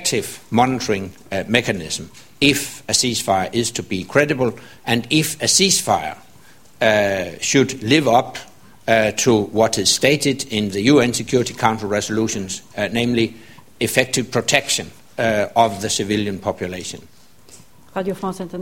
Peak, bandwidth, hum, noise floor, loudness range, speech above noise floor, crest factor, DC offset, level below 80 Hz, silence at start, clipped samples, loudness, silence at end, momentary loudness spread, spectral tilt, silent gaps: 0 dBFS; 16.5 kHz; none; -49 dBFS; 3 LU; 30 dB; 20 dB; 0.4%; -50 dBFS; 0 s; under 0.1%; -18 LUFS; 0 s; 12 LU; -3.5 dB/octave; none